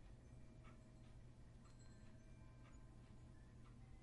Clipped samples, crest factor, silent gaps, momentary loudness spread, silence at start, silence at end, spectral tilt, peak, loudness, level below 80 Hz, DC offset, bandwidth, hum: under 0.1%; 12 dB; none; 1 LU; 0 s; 0 s; -6.5 dB/octave; -50 dBFS; -65 LUFS; -66 dBFS; under 0.1%; 11 kHz; none